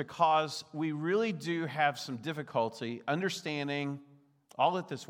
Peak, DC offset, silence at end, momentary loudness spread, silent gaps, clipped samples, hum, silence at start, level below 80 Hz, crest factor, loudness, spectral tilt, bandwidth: -14 dBFS; under 0.1%; 0.05 s; 10 LU; none; under 0.1%; none; 0 s; -84 dBFS; 20 dB; -33 LUFS; -5 dB/octave; 17.5 kHz